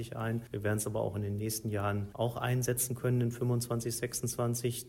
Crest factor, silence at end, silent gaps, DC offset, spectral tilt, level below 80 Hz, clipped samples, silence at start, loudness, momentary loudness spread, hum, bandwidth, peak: 16 dB; 0 s; none; under 0.1%; -5 dB/octave; -60 dBFS; under 0.1%; 0 s; -33 LUFS; 4 LU; none; 16 kHz; -18 dBFS